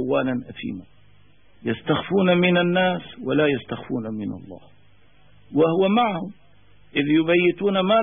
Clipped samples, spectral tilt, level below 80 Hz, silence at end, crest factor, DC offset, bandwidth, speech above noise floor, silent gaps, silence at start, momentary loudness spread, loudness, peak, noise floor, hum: under 0.1%; -11 dB/octave; -60 dBFS; 0 s; 16 dB; 0.3%; 3.7 kHz; 36 dB; none; 0 s; 15 LU; -22 LUFS; -6 dBFS; -57 dBFS; none